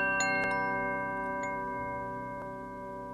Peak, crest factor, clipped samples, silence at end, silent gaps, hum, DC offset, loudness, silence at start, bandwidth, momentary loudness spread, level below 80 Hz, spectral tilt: -18 dBFS; 16 dB; under 0.1%; 0 s; none; none; under 0.1%; -33 LUFS; 0 s; 14 kHz; 13 LU; -58 dBFS; -4 dB/octave